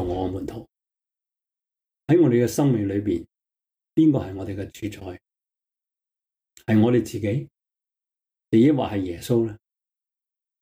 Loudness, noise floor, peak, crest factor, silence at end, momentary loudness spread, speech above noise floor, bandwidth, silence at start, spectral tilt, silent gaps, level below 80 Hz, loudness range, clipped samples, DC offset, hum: -22 LUFS; -87 dBFS; -8 dBFS; 16 dB; 1.05 s; 16 LU; 66 dB; 16.5 kHz; 0 s; -7.5 dB/octave; none; -54 dBFS; 4 LU; under 0.1%; under 0.1%; none